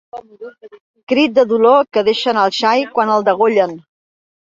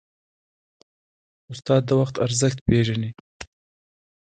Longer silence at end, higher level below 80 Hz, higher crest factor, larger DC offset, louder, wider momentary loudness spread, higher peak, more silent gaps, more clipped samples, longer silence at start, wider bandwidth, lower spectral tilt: second, 0.75 s vs 0.9 s; second, -62 dBFS vs -46 dBFS; second, 14 dB vs 20 dB; neither; first, -14 LUFS vs -22 LUFS; second, 19 LU vs 22 LU; about the same, -2 dBFS vs -4 dBFS; second, 0.81-0.94 s, 1.03-1.07 s vs 2.61-2.66 s, 3.20-3.40 s; neither; second, 0.15 s vs 1.5 s; second, 7.6 kHz vs 9.4 kHz; about the same, -4.5 dB/octave vs -5.5 dB/octave